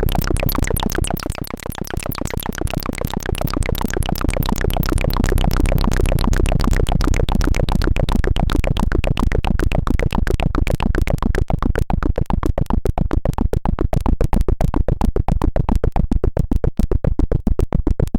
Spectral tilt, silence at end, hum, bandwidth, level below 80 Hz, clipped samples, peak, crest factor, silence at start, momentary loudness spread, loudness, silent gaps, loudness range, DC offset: -6 dB/octave; 0 s; none; 17 kHz; -18 dBFS; under 0.1%; -4 dBFS; 14 dB; 0 s; 5 LU; -21 LUFS; none; 3 LU; under 0.1%